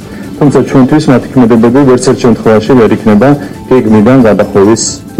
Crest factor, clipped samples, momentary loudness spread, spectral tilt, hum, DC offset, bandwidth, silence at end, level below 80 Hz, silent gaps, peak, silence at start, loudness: 6 dB; 0.4%; 5 LU; -6.5 dB/octave; none; under 0.1%; 14 kHz; 0 s; -34 dBFS; none; 0 dBFS; 0 s; -6 LUFS